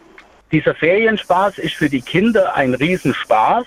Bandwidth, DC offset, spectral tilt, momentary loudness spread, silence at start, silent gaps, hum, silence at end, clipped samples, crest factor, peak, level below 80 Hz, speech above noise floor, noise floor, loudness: 15.5 kHz; under 0.1%; -6 dB/octave; 5 LU; 0.5 s; none; none; 0 s; under 0.1%; 14 dB; -2 dBFS; -48 dBFS; 30 dB; -45 dBFS; -16 LUFS